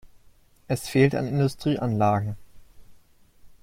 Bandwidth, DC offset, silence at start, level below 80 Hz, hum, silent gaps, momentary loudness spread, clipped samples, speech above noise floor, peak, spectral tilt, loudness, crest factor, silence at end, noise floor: 16 kHz; under 0.1%; 0.05 s; -54 dBFS; none; none; 10 LU; under 0.1%; 32 dB; -6 dBFS; -7 dB/octave; -24 LUFS; 20 dB; 0.1 s; -55 dBFS